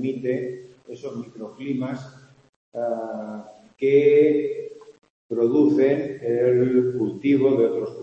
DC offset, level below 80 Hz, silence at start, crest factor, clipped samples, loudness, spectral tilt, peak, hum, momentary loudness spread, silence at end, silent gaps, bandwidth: under 0.1%; -68 dBFS; 0 s; 16 dB; under 0.1%; -21 LUFS; -8.5 dB/octave; -6 dBFS; none; 19 LU; 0 s; 2.49-2.72 s, 5.10-5.29 s; 7.6 kHz